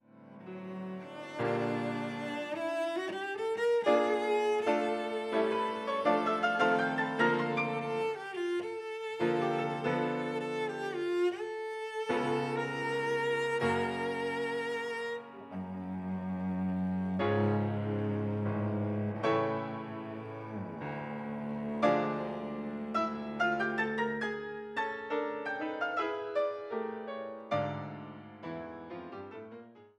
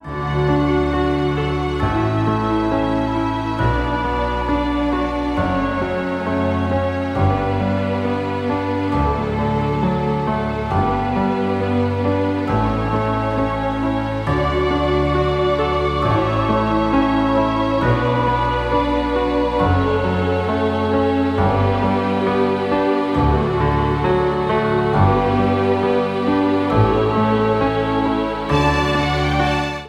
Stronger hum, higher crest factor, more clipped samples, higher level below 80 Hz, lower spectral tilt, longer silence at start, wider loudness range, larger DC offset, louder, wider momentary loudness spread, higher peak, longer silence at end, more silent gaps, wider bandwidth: neither; about the same, 18 dB vs 18 dB; neither; second, -72 dBFS vs -30 dBFS; about the same, -6.5 dB/octave vs -7.5 dB/octave; about the same, 0.15 s vs 0.05 s; about the same, 5 LU vs 3 LU; neither; second, -33 LUFS vs -18 LUFS; first, 13 LU vs 4 LU; second, -14 dBFS vs 0 dBFS; about the same, 0.1 s vs 0 s; neither; first, 12 kHz vs 10.5 kHz